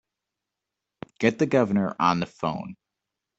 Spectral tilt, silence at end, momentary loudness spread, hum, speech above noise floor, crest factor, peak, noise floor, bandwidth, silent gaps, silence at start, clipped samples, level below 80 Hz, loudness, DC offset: -6.5 dB/octave; 0.65 s; 20 LU; none; 62 dB; 22 dB; -6 dBFS; -86 dBFS; 8 kHz; none; 1.2 s; under 0.1%; -64 dBFS; -24 LUFS; under 0.1%